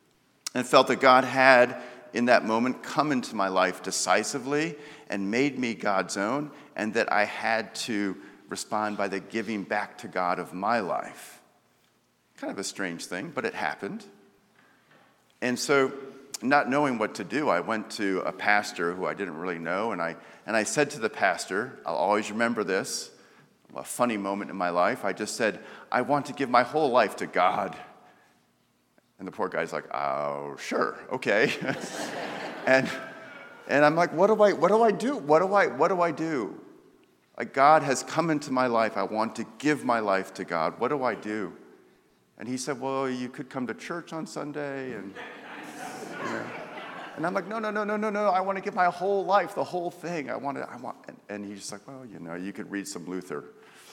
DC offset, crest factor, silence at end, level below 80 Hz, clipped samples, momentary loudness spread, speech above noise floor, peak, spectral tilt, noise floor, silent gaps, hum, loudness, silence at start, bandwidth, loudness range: under 0.1%; 26 dB; 0 s; -80 dBFS; under 0.1%; 17 LU; 41 dB; -2 dBFS; -4 dB/octave; -68 dBFS; none; none; -27 LUFS; 0.45 s; 17 kHz; 11 LU